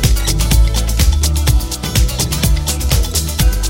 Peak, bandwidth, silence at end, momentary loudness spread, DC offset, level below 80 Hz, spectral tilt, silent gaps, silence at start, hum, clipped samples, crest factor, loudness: 0 dBFS; 17 kHz; 0 s; 3 LU; under 0.1%; -14 dBFS; -4 dB/octave; none; 0 s; none; under 0.1%; 12 dB; -15 LUFS